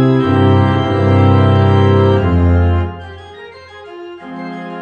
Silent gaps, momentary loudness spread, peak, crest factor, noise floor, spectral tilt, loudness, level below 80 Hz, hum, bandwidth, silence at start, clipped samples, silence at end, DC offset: none; 22 LU; 0 dBFS; 12 dB; -34 dBFS; -9 dB/octave; -12 LUFS; -30 dBFS; none; 5 kHz; 0 s; under 0.1%; 0 s; under 0.1%